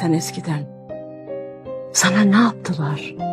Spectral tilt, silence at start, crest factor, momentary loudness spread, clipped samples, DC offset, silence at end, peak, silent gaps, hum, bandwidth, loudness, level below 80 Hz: -4.5 dB/octave; 0 s; 18 dB; 19 LU; under 0.1%; under 0.1%; 0 s; -2 dBFS; none; none; 14.5 kHz; -19 LUFS; -60 dBFS